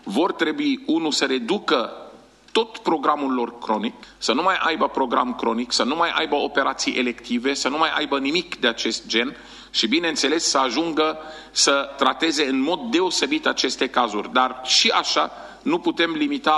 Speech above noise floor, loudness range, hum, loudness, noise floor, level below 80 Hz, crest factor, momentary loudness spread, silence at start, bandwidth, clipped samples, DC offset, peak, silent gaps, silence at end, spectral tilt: 25 dB; 3 LU; none; -21 LUFS; -47 dBFS; -58 dBFS; 20 dB; 6 LU; 0.05 s; 12 kHz; under 0.1%; under 0.1%; -2 dBFS; none; 0 s; -2 dB/octave